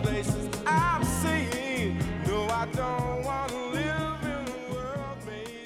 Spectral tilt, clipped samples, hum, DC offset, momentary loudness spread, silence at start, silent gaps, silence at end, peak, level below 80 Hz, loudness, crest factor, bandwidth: -5 dB/octave; under 0.1%; none; under 0.1%; 9 LU; 0 s; none; 0 s; -12 dBFS; -44 dBFS; -29 LUFS; 18 dB; 17.5 kHz